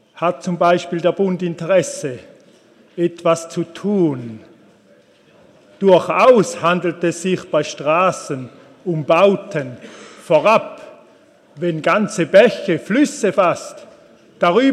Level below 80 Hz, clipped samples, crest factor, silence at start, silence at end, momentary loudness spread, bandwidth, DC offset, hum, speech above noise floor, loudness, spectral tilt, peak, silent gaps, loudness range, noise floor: -70 dBFS; under 0.1%; 18 dB; 0.15 s; 0 s; 17 LU; 13 kHz; under 0.1%; none; 35 dB; -17 LUFS; -5.5 dB/octave; 0 dBFS; none; 5 LU; -51 dBFS